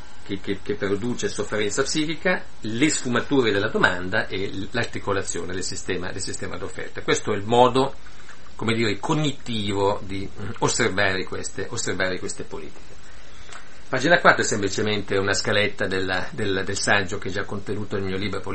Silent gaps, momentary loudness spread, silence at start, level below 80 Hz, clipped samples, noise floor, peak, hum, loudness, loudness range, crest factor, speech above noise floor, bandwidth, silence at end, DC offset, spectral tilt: none; 12 LU; 0 s; -50 dBFS; under 0.1%; -45 dBFS; 0 dBFS; none; -24 LUFS; 4 LU; 24 dB; 21 dB; 8.8 kHz; 0 s; 4%; -4 dB/octave